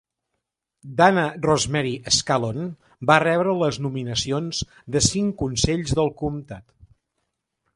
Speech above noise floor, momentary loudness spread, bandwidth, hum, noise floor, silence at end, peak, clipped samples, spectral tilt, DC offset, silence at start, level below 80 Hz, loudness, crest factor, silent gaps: 58 dB; 12 LU; 11.5 kHz; none; -80 dBFS; 1.15 s; -2 dBFS; under 0.1%; -4 dB/octave; under 0.1%; 0.85 s; -44 dBFS; -22 LUFS; 22 dB; none